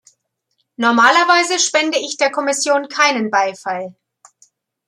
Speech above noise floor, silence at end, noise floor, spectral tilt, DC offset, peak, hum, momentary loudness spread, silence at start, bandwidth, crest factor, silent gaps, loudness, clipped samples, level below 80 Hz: 54 dB; 0.95 s; -70 dBFS; -1.5 dB/octave; under 0.1%; 0 dBFS; none; 12 LU; 0.8 s; 13 kHz; 16 dB; none; -15 LUFS; under 0.1%; -74 dBFS